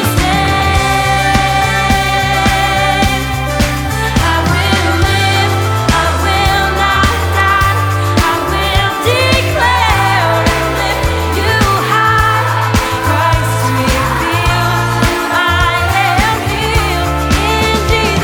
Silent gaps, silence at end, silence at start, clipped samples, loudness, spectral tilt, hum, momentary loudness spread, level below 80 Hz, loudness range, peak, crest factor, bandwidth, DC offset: none; 0 s; 0 s; under 0.1%; -12 LUFS; -4.5 dB/octave; none; 3 LU; -22 dBFS; 1 LU; 0 dBFS; 12 dB; over 20 kHz; under 0.1%